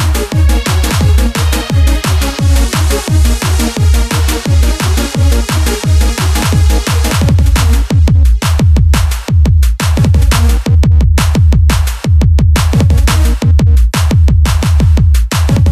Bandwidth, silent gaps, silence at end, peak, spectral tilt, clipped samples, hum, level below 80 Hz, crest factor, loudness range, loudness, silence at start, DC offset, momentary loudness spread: 14 kHz; none; 0 s; 0 dBFS; -5.5 dB/octave; under 0.1%; none; -10 dBFS; 8 dB; 2 LU; -10 LUFS; 0 s; under 0.1%; 3 LU